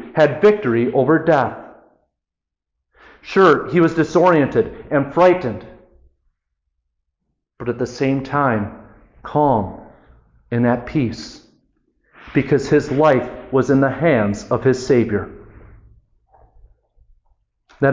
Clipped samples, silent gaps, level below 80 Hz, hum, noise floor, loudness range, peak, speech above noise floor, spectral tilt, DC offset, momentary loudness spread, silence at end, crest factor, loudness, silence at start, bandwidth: under 0.1%; none; -48 dBFS; none; -84 dBFS; 7 LU; -4 dBFS; 67 dB; -7.5 dB/octave; under 0.1%; 12 LU; 0 s; 16 dB; -17 LUFS; 0 s; 7.6 kHz